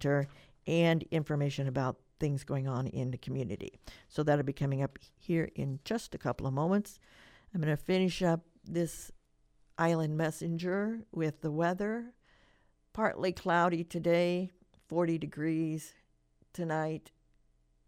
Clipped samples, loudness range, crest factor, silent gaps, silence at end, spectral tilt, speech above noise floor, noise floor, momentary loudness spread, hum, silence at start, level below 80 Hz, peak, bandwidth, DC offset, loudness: under 0.1%; 3 LU; 20 dB; none; 0.85 s; -7 dB/octave; 37 dB; -70 dBFS; 12 LU; none; 0 s; -60 dBFS; -14 dBFS; 15.5 kHz; under 0.1%; -33 LUFS